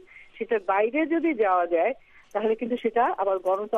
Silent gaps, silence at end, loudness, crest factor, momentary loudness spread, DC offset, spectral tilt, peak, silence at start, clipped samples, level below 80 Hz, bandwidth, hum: none; 0 s; -25 LUFS; 14 dB; 6 LU; under 0.1%; -6.5 dB/octave; -12 dBFS; 0.15 s; under 0.1%; -64 dBFS; 6.6 kHz; none